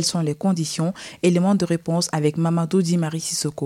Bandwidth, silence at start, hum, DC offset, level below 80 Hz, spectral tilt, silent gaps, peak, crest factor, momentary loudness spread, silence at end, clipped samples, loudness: 15 kHz; 0 s; none; under 0.1%; -62 dBFS; -5.5 dB/octave; none; -6 dBFS; 14 dB; 5 LU; 0 s; under 0.1%; -21 LUFS